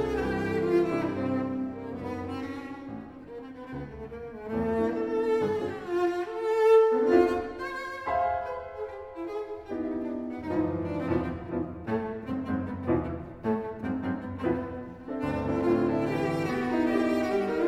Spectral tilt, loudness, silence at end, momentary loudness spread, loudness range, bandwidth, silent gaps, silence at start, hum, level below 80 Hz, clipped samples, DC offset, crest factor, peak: -7.5 dB/octave; -29 LUFS; 0 s; 13 LU; 8 LU; 13 kHz; none; 0 s; none; -52 dBFS; under 0.1%; under 0.1%; 20 dB; -10 dBFS